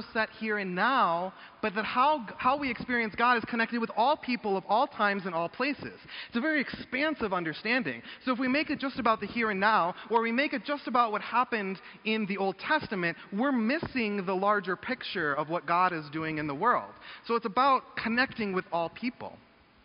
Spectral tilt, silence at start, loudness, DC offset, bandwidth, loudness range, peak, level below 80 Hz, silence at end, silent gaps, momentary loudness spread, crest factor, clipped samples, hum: -2.5 dB/octave; 0 s; -29 LUFS; under 0.1%; 5.4 kHz; 2 LU; -10 dBFS; -64 dBFS; 0.5 s; none; 8 LU; 20 dB; under 0.1%; none